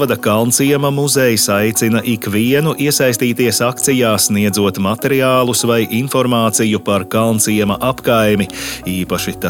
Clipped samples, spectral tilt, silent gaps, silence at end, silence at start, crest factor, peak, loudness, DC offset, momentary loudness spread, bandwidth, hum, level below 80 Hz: under 0.1%; -4 dB/octave; none; 0 s; 0 s; 14 dB; 0 dBFS; -14 LUFS; under 0.1%; 5 LU; 17.5 kHz; none; -46 dBFS